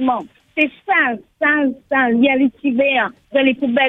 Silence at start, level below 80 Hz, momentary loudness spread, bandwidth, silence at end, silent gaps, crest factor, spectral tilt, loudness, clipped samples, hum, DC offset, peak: 0 s; -60 dBFS; 6 LU; 3.9 kHz; 0 s; none; 14 dB; -6.5 dB/octave; -17 LUFS; under 0.1%; none; under 0.1%; -2 dBFS